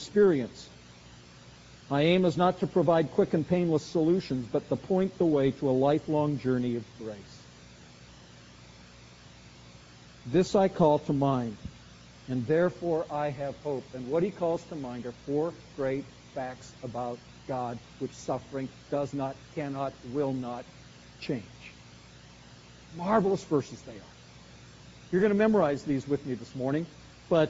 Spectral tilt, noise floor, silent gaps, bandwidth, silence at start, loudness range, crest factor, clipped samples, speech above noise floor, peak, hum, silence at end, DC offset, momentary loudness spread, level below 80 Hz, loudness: -6.5 dB/octave; -52 dBFS; none; 7.6 kHz; 0 s; 9 LU; 20 dB; under 0.1%; 23 dB; -10 dBFS; 60 Hz at -55 dBFS; 0 s; under 0.1%; 18 LU; -60 dBFS; -29 LUFS